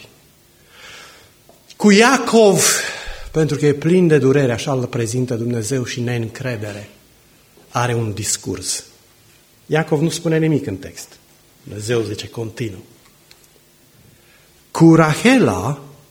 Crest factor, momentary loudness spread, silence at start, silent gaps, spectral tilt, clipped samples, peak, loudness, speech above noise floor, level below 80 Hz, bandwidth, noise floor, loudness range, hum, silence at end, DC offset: 18 dB; 19 LU; 0.85 s; none; -5 dB/octave; under 0.1%; 0 dBFS; -17 LUFS; 35 dB; -48 dBFS; 17 kHz; -51 dBFS; 11 LU; none; 0.2 s; under 0.1%